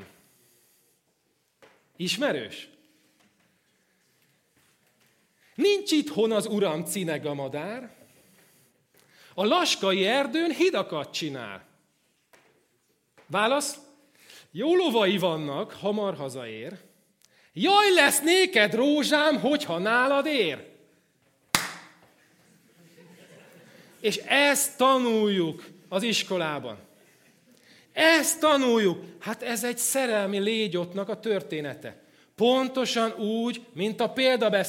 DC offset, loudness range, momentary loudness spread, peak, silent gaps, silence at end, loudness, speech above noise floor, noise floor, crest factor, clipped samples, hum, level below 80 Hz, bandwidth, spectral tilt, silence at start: under 0.1%; 11 LU; 16 LU; -4 dBFS; none; 0 s; -25 LUFS; 47 dB; -72 dBFS; 24 dB; under 0.1%; none; -76 dBFS; 16.5 kHz; -3 dB/octave; 0 s